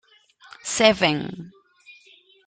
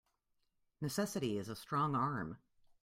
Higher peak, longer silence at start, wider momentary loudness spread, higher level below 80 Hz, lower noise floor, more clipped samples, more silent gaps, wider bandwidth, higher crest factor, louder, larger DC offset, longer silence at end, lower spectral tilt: first, -2 dBFS vs -22 dBFS; second, 0.65 s vs 0.8 s; first, 19 LU vs 11 LU; first, -60 dBFS vs -72 dBFS; second, -55 dBFS vs -81 dBFS; neither; neither; second, 9.4 kHz vs 16 kHz; first, 24 dB vs 18 dB; first, -20 LUFS vs -39 LUFS; neither; about the same, 0.55 s vs 0.45 s; second, -3 dB/octave vs -5.5 dB/octave